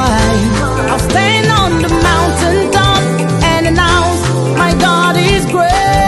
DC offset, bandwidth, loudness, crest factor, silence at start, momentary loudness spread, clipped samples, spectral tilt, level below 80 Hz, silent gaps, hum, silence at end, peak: under 0.1%; 12.5 kHz; -11 LUFS; 10 dB; 0 s; 3 LU; under 0.1%; -5 dB/octave; -22 dBFS; none; none; 0 s; 0 dBFS